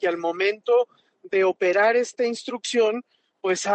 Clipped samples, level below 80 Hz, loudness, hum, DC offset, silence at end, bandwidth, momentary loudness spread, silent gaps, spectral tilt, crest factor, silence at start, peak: under 0.1%; -80 dBFS; -23 LUFS; none; under 0.1%; 0 s; 9 kHz; 10 LU; none; -3 dB/octave; 12 dB; 0 s; -10 dBFS